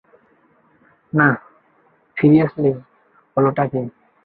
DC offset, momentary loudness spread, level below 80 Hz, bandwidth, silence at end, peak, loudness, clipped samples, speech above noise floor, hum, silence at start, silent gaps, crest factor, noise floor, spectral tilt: under 0.1%; 16 LU; -58 dBFS; 4.6 kHz; 0.35 s; -2 dBFS; -18 LUFS; under 0.1%; 42 dB; none; 1.15 s; none; 18 dB; -58 dBFS; -13 dB/octave